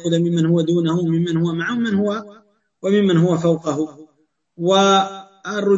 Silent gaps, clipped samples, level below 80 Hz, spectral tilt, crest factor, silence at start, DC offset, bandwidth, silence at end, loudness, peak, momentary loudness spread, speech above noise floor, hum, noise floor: none; under 0.1%; -60 dBFS; -6 dB/octave; 16 dB; 0 s; under 0.1%; 7.8 kHz; 0 s; -18 LUFS; -4 dBFS; 11 LU; 46 dB; none; -64 dBFS